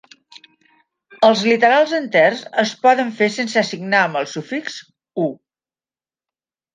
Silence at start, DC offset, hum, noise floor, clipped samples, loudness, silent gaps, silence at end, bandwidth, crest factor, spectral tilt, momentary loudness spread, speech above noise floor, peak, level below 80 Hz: 1.1 s; under 0.1%; none; under -90 dBFS; under 0.1%; -17 LUFS; none; 1.4 s; 9.6 kHz; 18 dB; -4 dB/octave; 12 LU; over 73 dB; -2 dBFS; -72 dBFS